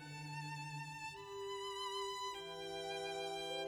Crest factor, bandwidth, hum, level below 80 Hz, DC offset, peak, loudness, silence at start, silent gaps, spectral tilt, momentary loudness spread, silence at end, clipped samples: 12 dB; 19.5 kHz; 50 Hz at -75 dBFS; -76 dBFS; under 0.1%; -32 dBFS; -45 LUFS; 0 s; none; -3.5 dB/octave; 5 LU; 0 s; under 0.1%